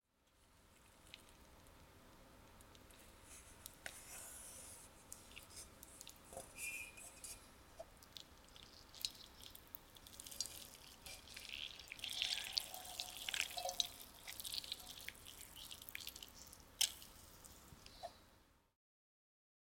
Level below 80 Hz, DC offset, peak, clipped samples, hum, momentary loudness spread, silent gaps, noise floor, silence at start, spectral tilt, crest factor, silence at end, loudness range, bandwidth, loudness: -70 dBFS; under 0.1%; -16 dBFS; under 0.1%; none; 21 LU; none; -75 dBFS; 0.25 s; 0 dB/octave; 36 dB; 1.15 s; 13 LU; 17 kHz; -47 LUFS